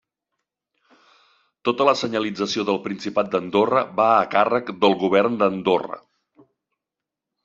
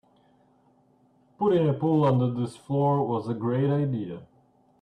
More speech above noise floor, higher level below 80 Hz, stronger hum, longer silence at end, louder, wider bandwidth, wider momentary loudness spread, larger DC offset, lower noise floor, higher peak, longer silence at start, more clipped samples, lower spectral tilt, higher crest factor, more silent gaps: first, 66 dB vs 38 dB; about the same, -66 dBFS vs -66 dBFS; neither; first, 1.45 s vs 0.6 s; first, -21 LUFS vs -25 LUFS; second, 7.8 kHz vs 9.6 kHz; about the same, 8 LU vs 10 LU; neither; first, -86 dBFS vs -63 dBFS; first, -2 dBFS vs -12 dBFS; first, 1.65 s vs 1.4 s; neither; second, -5 dB/octave vs -9.5 dB/octave; first, 20 dB vs 14 dB; neither